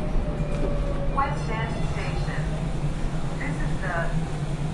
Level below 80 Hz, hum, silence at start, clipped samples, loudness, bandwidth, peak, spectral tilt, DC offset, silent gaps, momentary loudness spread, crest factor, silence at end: -30 dBFS; none; 0 s; under 0.1%; -28 LUFS; 11.5 kHz; -10 dBFS; -6.5 dB/octave; under 0.1%; none; 3 LU; 14 dB; 0 s